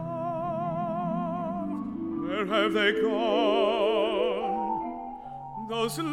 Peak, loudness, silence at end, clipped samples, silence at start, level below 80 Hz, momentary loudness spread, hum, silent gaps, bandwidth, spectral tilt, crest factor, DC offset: -12 dBFS; -28 LUFS; 0 s; under 0.1%; 0 s; -60 dBFS; 11 LU; none; none; 16.5 kHz; -5.5 dB/octave; 16 dB; under 0.1%